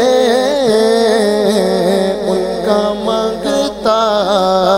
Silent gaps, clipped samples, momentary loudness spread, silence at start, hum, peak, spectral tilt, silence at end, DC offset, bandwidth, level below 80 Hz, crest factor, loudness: none; under 0.1%; 5 LU; 0 s; none; 0 dBFS; -4.5 dB/octave; 0 s; under 0.1%; 16 kHz; -44 dBFS; 12 dB; -13 LUFS